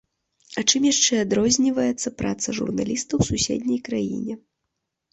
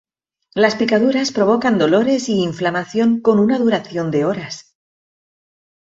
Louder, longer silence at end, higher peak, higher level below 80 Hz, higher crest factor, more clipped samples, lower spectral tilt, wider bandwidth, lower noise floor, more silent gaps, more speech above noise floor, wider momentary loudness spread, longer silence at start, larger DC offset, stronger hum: second, -22 LUFS vs -17 LUFS; second, 0.75 s vs 1.3 s; about the same, -4 dBFS vs -2 dBFS; first, -48 dBFS vs -60 dBFS; about the same, 20 dB vs 16 dB; neither; second, -3.5 dB/octave vs -5.5 dB/octave; about the same, 8.2 kHz vs 8 kHz; first, -80 dBFS vs -60 dBFS; neither; first, 57 dB vs 44 dB; first, 10 LU vs 7 LU; about the same, 0.5 s vs 0.55 s; neither; neither